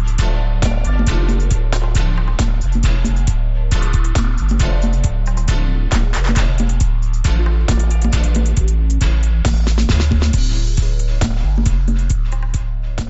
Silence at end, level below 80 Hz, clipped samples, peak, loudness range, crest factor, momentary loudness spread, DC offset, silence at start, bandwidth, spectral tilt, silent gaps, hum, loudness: 0 s; -14 dBFS; under 0.1%; -2 dBFS; 2 LU; 12 dB; 3 LU; under 0.1%; 0 s; 8 kHz; -5.5 dB/octave; none; none; -17 LUFS